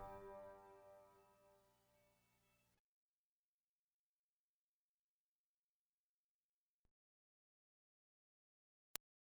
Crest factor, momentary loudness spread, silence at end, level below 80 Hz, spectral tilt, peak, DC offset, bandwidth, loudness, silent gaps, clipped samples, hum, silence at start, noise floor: 50 dB; 12 LU; 0.35 s; -82 dBFS; -2.5 dB/octave; -16 dBFS; under 0.1%; over 20 kHz; -58 LUFS; 2.79-6.85 s, 6.91-8.95 s; under 0.1%; none; 0 s; under -90 dBFS